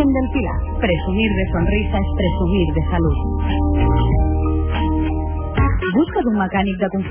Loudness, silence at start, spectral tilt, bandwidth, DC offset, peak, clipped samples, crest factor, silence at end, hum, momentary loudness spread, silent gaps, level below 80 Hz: -19 LUFS; 0 s; -11.5 dB/octave; 3.5 kHz; under 0.1%; -6 dBFS; under 0.1%; 12 dB; 0 s; none; 4 LU; none; -22 dBFS